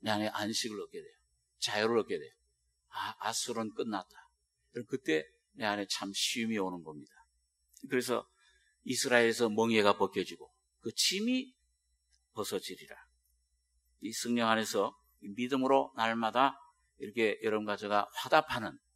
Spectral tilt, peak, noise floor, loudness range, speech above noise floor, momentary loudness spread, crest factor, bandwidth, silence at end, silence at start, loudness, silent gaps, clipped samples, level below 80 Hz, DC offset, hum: -3 dB/octave; -8 dBFS; -77 dBFS; 6 LU; 44 dB; 18 LU; 26 dB; 16 kHz; 0.2 s; 0.05 s; -33 LUFS; none; under 0.1%; -74 dBFS; under 0.1%; none